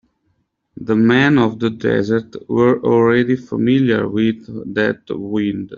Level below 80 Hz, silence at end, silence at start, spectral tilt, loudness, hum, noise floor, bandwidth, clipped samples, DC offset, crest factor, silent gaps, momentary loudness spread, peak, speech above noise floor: -54 dBFS; 0 s; 0.8 s; -5.5 dB/octave; -16 LUFS; none; -66 dBFS; 7.2 kHz; under 0.1%; under 0.1%; 14 dB; none; 9 LU; -2 dBFS; 50 dB